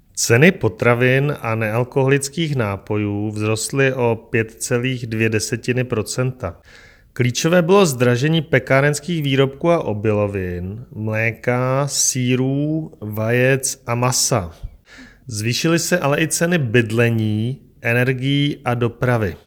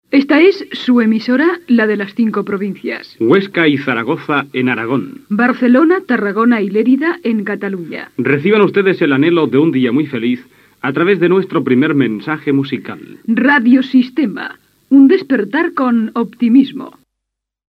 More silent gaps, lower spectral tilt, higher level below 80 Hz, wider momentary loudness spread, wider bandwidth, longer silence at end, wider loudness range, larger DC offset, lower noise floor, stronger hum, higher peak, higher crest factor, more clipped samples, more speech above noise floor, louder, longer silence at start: neither; second, -5 dB/octave vs -8 dB/octave; first, -48 dBFS vs -66 dBFS; second, 8 LU vs 11 LU; first, 19 kHz vs 6 kHz; second, 0.1 s vs 0.85 s; about the same, 3 LU vs 2 LU; neither; second, -44 dBFS vs -78 dBFS; neither; about the same, 0 dBFS vs 0 dBFS; about the same, 18 dB vs 14 dB; neither; second, 26 dB vs 65 dB; second, -18 LUFS vs -13 LUFS; about the same, 0.15 s vs 0.1 s